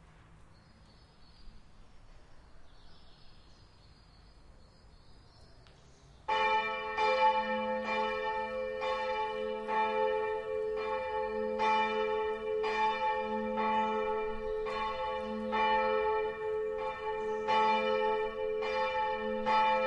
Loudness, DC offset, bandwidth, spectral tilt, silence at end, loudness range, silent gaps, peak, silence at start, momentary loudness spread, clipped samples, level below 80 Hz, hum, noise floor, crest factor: -32 LUFS; under 0.1%; 9.8 kHz; -4.5 dB/octave; 0 s; 2 LU; none; -18 dBFS; 0.05 s; 7 LU; under 0.1%; -58 dBFS; none; -59 dBFS; 16 dB